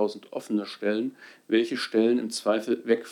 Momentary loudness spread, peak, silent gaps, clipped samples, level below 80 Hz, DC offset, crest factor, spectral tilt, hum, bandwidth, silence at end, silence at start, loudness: 7 LU; -10 dBFS; none; under 0.1%; under -90 dBFS; under 0.1%; 18 dB; -4.5 dB/octave; none; 14.5 kHz; 0 s; 0 s; -27 LUFS